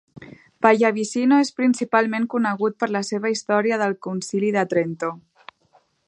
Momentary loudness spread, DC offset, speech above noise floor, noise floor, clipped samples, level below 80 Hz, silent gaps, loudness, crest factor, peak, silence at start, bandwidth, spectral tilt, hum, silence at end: 8 LU; under 0.1%; 40 dB; -61 dBFS; under 0.1%; -70 dBFS; none; -21 LUFS; 20 dB; -2 dBFS; 0.15 s; 11 kHz; -5 dB/octave; none; 0.9 s